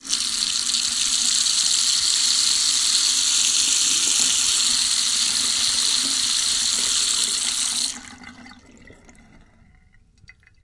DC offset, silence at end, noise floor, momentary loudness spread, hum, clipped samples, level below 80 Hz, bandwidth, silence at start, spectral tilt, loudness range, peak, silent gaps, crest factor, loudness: under 0.1%; 1.7 s; -54 dBFS; 4 LU; none; under 0.1%; -56 dBFS; 11.5 kHz; 0.05 s; 2.5 dB/octave; 7 LU; -2 dBFS; none; 20 dB; -17 LUFS